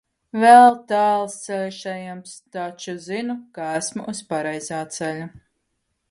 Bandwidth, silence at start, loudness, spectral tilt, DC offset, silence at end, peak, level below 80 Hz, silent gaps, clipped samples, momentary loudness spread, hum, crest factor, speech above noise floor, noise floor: 11.5 kHz; 0.35 s; -20 LUFS; -4 dB/octave; under 0.1%; 0.85 s; 0 dBFS; -68 dBFS; none; under 0.1%; 21 LU; none; 20 dB; 54 dB; -74 dBFS